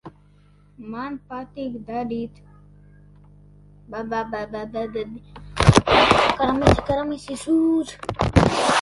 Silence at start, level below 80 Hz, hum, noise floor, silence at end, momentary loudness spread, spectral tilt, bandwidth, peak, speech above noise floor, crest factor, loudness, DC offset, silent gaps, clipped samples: 0.05 s; -36 dBFS; 50 Hz at -45 dBFS; -53 dBFS; 0 s; 19 LU; -5.5 dB/octave; 11.5 kHz; 0 dBFS; 29 dB; 22 dB; -21 LUFS; under 0.1%; none; under 0.1%